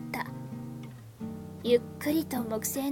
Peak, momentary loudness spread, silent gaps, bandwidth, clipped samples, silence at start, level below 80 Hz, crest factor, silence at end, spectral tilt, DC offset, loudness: -12 dBFS; 15 LU; none; 18 kHz; under 0.1%; 0 s; -62 dBFS; 20 dB; 0 s; -5 dB/octave; under 0.1%; -32 LUFS